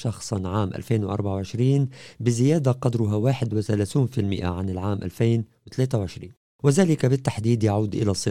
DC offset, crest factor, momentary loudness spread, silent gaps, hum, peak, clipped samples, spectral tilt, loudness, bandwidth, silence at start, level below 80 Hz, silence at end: 0.2%; 16 dB; 7 LU; 6.37-6.59 s; none; -6 dBFS; under 0.1%; -7 dB/octave; -24 LUFS; 13 kHz; 0 s; -52 dBFS; 0 s